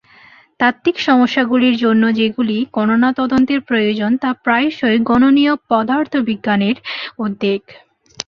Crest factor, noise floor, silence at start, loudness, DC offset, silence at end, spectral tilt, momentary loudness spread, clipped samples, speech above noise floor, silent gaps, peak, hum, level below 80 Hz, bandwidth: 14 dB; -46 dBFS; 0.6 s; -15 LUFS; under 0.1%; 0.05 s; -5.5 dB/octave; 7 LU; under 0.1%; 31 dB; none; -2 dBFS; none; -52 dBFS; 7 kHz